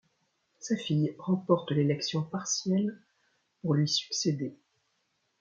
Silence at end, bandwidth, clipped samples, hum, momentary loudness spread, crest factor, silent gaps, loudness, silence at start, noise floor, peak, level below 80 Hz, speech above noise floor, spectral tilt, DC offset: 0.85 s; 7.6 kHz; under 0.1%; none; 9 LU; 20 dB; none; -30 LUFS; 0.6 s; -76 dBFS; -10 dBFS; -74 dBFS; 47 dB; -5 dB/octave; under 0.1%